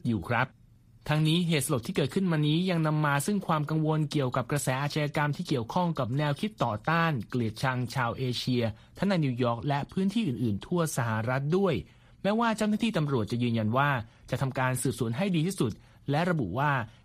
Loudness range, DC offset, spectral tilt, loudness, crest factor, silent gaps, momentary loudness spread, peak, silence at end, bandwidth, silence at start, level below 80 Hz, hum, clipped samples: 2 LU; under 0.1%; -6 dB/octave; -29 LUFS; 18 dB; none; 5 LU; -12 dBFS; 0.15 s; 15.5 kHz; 0.05 s; -58 dBFS; none; under 0.1%